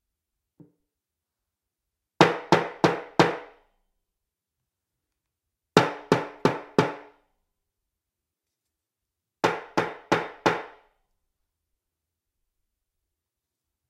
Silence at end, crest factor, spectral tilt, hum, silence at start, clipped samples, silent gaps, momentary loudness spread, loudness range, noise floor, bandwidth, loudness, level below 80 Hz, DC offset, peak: 3.2 s; 30 dB; -5.5 dB/octave; none; 2.2 s; under 0.1%; none; 8 LU; 6 LU; -86 dBFS; 16 kHz; -25 LUFS; -68 dBFS; under 0.1%; 0 dBFS